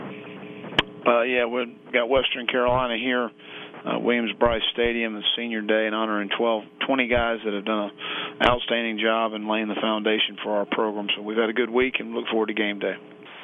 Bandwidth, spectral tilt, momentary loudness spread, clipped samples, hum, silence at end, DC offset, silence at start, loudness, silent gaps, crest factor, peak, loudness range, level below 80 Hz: 8 kHz; -6 dB/octave; 8 LU; under 0.1%; none; 0 s; under 0.1%; 0 s; -24 LUFS; none; 22 dB; -4 dBFS; 1 LU; -48 dBFS